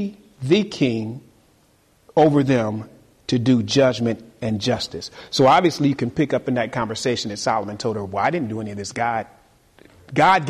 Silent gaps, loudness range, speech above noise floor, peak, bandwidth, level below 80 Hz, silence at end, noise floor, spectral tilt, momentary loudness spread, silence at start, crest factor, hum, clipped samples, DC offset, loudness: none; 4 LU; 38 dB; -4 dBFS; 13 kHz; -54 dBFS; 0 s; -58 dBFS; -5.5 dB/octave; 13 LU; 0 s; 16 dB; none; under 0.1%; under 0.1%; -21 LUFS